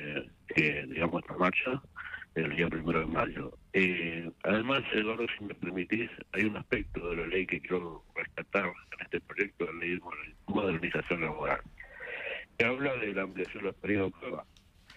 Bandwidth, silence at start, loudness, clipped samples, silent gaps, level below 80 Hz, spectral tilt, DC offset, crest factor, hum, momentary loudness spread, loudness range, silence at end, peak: 11.5 kHz; 0 s; -33 LUFS; under 0.1%; none; -56 dBFS; -7 dB/octave; under 0.1%; 20 dB; none; 10 LU; 3 LU; 0 s; -14 dBFS